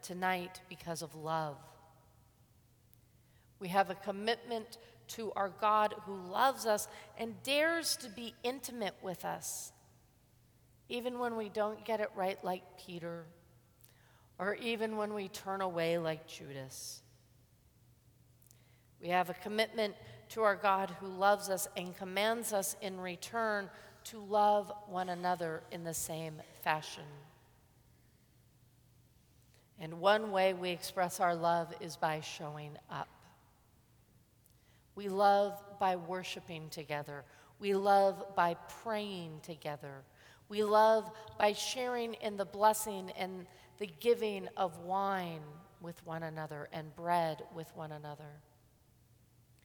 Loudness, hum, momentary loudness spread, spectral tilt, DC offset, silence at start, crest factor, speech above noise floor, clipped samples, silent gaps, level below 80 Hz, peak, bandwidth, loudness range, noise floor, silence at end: -36 LUFS; none; 17 LU; -3.5 dB/octave; under 0.1%; 0.05 s; 24 dB; 31 dB; under 0.1%; none; -74 dBFS; -14 dBFS; 19.5 kHz; 8 LU; -67 dBFS; 1.25 s